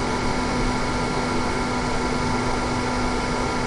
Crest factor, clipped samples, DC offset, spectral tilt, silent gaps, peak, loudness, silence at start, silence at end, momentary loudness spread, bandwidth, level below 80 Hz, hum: 14 dB; under 0.1%; under 0.1%; -5 dB/octave; none; -10 dBFS; -24 LUFS; 0 s; 0 s; 1 LU; 11.5 kHz; -32 dBFS; none